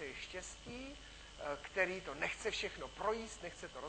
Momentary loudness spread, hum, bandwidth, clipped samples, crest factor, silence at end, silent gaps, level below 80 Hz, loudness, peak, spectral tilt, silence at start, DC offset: 12 LU; none; 9 kHz; under 0.1%; 24 dB; 0 s; none; -60 dBFS; -42 LUFS; -20 dBFS; -3 dB/octave; 0 s; under 0.1%